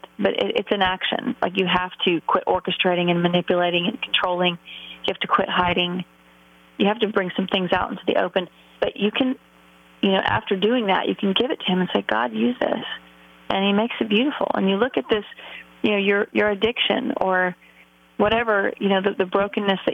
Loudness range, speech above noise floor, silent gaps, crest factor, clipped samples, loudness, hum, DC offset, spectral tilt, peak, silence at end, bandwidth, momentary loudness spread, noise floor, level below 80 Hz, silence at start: 2 LU; 31 dB; none; 16 dB; under 0.1%; -22 LUFS; none; under 0.1%; -7 dB/octave; -6 dBFS; 0 s; 6.2 kHz; 7 LU; -53 dBFS; -54 dBFS; 0.2 s